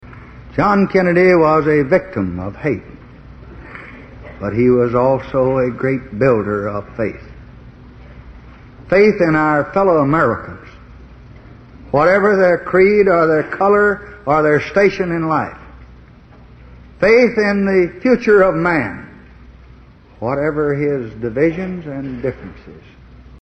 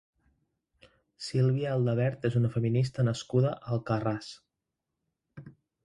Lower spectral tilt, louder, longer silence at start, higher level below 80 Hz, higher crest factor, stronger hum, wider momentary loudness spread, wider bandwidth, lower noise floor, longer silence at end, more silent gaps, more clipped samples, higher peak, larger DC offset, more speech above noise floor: about the same, -8 dB/octave vs -7.5 dB/octave; first, -15 LUFS vs -29 LUFS; second, 0.05 s vs 1.2 s; first, -42 dBFS vs -62 dBFS; about the same, 16 dB vs 18 dB; neither; first, 14 LU vs 7 LU; second, 8.2 kHz vs 10.5 kHz; second, -43 dBFS vs -86 dBFS; first, 0.65 s vs 0.35 s; neither; neither; first, 0 dBFS vs -14 dBFS; neither; second, 28 dB vs 58 dB